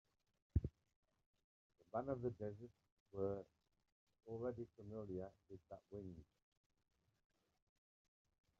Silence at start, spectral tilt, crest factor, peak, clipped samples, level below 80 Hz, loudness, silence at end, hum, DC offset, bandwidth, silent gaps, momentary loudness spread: 0.55 s; -10.5 dB/octave; 26 dB; -26 dBFS; under 0.1%; -62 dBFS; -50 LUFS; 2.35 s; none; under 0.1%; 7.2 kHz; 0.96-1.03 s, 1.26-1.34 s, 1.44-1.70 s, 2.92-3.06 s, 3.92-4.07 s; 16 LU